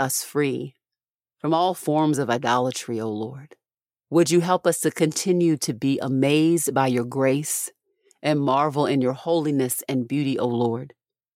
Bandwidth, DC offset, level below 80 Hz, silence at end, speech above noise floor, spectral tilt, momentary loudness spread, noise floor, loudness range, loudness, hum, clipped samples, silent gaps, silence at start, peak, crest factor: 16.5 kHz; under 0.1%; -72 dBFS; 0.45 s; over 68 dB; -5 dB/octave; 9 LU; under -90 dBFS; 3 LU; -23 LUFS; none; under 0.1%; 1.11-1.19 s; 0 s; -6 dBFS; 18 dB